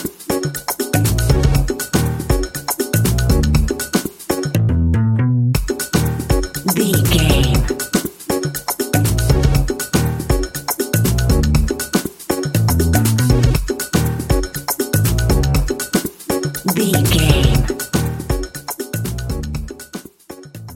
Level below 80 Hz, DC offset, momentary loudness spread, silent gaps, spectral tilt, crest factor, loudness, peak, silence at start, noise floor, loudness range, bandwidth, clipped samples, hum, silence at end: -22 dBFS; under 0.1%; 9 LU; none; -5 dB/octave; 16 dB; -17 LUFS; 0 dBFS; 0 s; -37 dBFS; 2 LU; 17 kHz; under 0.1%; none; 0 s